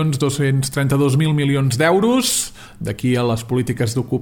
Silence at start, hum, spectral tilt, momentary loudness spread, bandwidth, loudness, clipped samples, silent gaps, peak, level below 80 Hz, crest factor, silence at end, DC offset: 0 s; none; -5 dB/octave; 6 LU; 18 kHz; -18 LUFS; under 0.1%; none; -4 dBFS; -46 dBFS; 14 dB; 0 s; under 0.1%